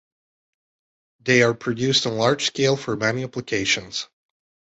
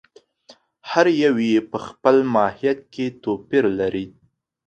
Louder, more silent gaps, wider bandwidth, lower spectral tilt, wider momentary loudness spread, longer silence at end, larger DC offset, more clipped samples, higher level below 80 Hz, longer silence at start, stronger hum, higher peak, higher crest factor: about the same, -21 LUFS vs -20 LUFS; neither; about the same, 8.2 kHz vs 8.4 kHz; second, -4 dB/octave vs -6 dB/octave; about the same, 13 LU vs 13 LU; first, 0.75 s vs 0.55 s; neither; neither; about the same, -58 dBFS vs -58 dBFS; first, 1.25 s vs 0.85 s; neither; second, -4 dBFS vs 0 dBFS; about the same, 20 dB vs 20 dB